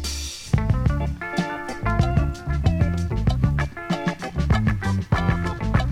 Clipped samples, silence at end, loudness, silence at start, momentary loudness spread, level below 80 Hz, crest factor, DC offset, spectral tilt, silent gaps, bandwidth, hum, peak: under 0.1%; 0 s; -24 LUFS; 0 s; 5 LU; -28 dBFS; 16 dB; under 0.1%; -6.5 dB/octave; none; 15 kHz; none; -6 dBFS